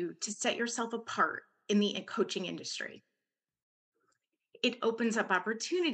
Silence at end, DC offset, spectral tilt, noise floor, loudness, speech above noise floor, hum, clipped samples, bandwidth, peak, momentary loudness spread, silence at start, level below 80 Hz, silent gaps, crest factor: 0 s; under 0.1%; -3.5 dB/octave; under -90 dBFS; -33 LUFS; over 57 dB; none; under 0.1%; 9.6 kHz; -16 dBFS; 8 LU; 0 s; under -90 dBFS; 3.62-3.92 s; 18 dB